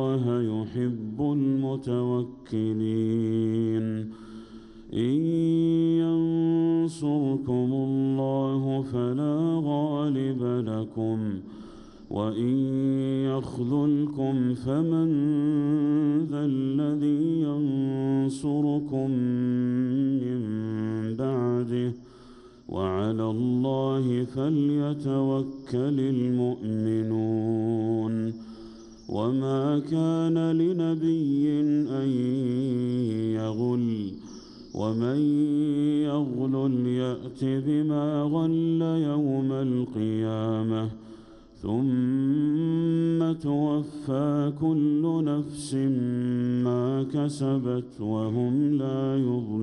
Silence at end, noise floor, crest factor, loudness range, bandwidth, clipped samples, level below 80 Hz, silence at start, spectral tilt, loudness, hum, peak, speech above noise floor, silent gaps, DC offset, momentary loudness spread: 0 s; -49 dBFS; 12 dB; 3 LU; 10.5 kHz; under 0.1%; -60 dBFS; 0 s; -9 dB/octave; -26 LUFS; none; -14 dBFS; 24 dB; none; under 0.1%; 7 LU